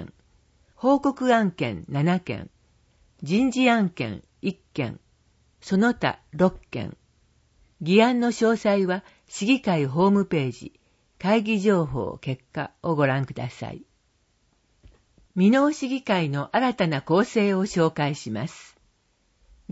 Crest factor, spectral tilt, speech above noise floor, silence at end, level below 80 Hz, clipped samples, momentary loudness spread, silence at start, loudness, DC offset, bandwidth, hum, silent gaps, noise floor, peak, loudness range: 20 dB; -6.5 dB/octave; 44 dB; 0 s; -56 dBFS; under 0.1%; 14 LU; 0 s; -24 LUFS; under 0.1%; 8 kHz; none; none; -67 dBFS; -4 dBFS; 5 LU